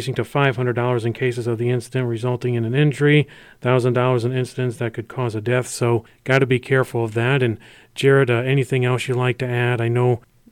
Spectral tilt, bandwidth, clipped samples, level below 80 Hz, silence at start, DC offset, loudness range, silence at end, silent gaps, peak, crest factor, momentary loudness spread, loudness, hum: -6.5 dB/octave; 13 kHz; under 0.1%; -58 dBFS; 0 s; under 0.1%; 2 LU; 0.35 s; none; -4 dBFS; 16 dB; 8 LU; -20 LUFS; none